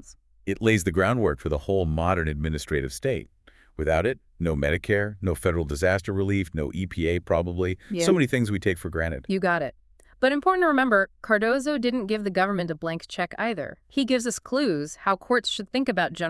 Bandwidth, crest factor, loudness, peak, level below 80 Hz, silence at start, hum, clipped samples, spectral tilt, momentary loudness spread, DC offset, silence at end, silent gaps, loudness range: 12 kHz; 18 dB; -25 LUFS; -6 dBFS; -44 dBFS; 0.05 s; none; under 0.1%; -5.5 dB/octave; 8 LU; under 0.1%; 0 s; none; 3 LU